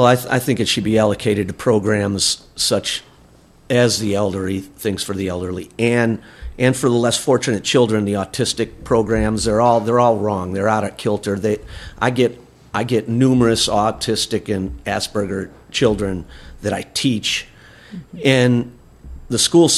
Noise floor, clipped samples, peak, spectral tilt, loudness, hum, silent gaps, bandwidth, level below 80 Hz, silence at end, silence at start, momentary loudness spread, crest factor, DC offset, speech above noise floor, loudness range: -48 dBFS; under 0.1%; 0 dBFS; -4.5 dB/octave; -18 LUFS; none; none; 14.5 kHz; -40 dBFS; 0 s; 0 s; 10 LU; 18 dB; under 0.1%; 31 dB; 4 LU